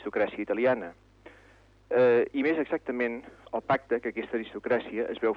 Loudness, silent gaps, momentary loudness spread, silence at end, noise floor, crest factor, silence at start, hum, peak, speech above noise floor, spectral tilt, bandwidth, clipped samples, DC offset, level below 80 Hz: -28 LUFS; none; 11 LU; 0 s; -58 dBFS; 16 dB; 0 s; none; -14 dBFS; 30 dB; -7.5 dB/octave; 5.4 kHz; under 0.1%; under 0.1%; -64 dBFS